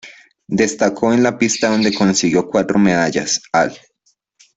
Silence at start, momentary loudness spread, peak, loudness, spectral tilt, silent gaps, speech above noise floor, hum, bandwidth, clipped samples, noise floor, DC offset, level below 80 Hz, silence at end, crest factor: 0.05 s; 4 LU; -2 dBFS; -16 LUFS; -4 dB/octave; none; 48 dB; none; 8.4 kHz; under 0.1%; -63 dBFS; under 0.1%; -52 dBFS; 0.8 s; 14 dB